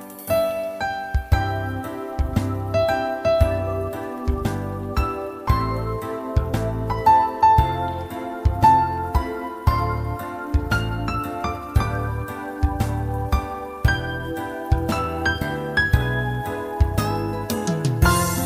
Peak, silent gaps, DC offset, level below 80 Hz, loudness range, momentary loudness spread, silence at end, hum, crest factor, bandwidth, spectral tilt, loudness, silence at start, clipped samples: -2 dBFS; none; under 0.1%; -30 dBFS; 5 LU; 11 LU; 0 s; none; 20 dB; 16 kHz; -6 dB/octave; -23 LUFS; 0 s; under 0.1%